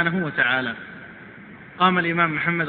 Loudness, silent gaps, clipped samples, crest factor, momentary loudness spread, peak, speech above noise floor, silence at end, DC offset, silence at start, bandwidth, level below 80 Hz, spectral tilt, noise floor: -21 LUFS; none; under 0.1%; 20 dB; 22 LU; -2 dBFS; 21 dB; 0 s; under 0.1%; 0 s; 4.6 kHz; -60 dBFS; -9 dB/octave; -42 dBFS